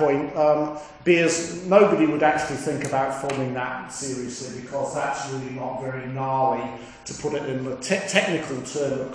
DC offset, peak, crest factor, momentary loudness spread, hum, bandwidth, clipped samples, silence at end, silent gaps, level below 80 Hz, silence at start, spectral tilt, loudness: under 0.1%; -2 dBFS; 22 dB; 12 LU; none; 10.5 kHz; under 0.1%; 0 s; none; -58 dBFS; 0 s; -4.5 dB/octave; -24 LUFS